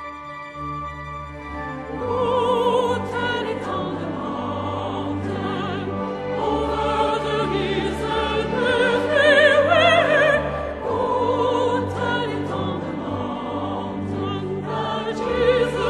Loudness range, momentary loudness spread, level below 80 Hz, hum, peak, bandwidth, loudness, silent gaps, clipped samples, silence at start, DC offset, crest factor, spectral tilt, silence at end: 8 LU; 15 LU; -42 dBFS; none; -2 dBFS; 11 kHz; -21 LUFS; none; under 0.1%; 0 s; under 0.1%; 20 dB; -5.5 dB/octave; 0 s